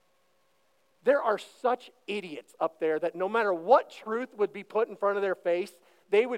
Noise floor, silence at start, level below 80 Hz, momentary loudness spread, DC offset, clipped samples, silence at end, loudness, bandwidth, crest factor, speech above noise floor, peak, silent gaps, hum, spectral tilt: -71 dBFS; 1.05 s; under -90 dBFS; 11 LU; under 0.1%; under 0.1%; 0 s; -29 LUFS; 13 kHz; 20 dB; 43 dB; -8 dBFS; none; none; -5 dB/octave